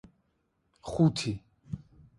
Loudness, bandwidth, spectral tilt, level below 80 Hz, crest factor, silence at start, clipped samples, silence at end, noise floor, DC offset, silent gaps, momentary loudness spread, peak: -29 LUFS; 11.5 kHz; -6.5 dB/octave; -56 dBFS; 20 dB; 0.85 s; under 0.1%; 0.4 s; -75 dBFS; under 0.1%; none; 17 LU; -12 dBFS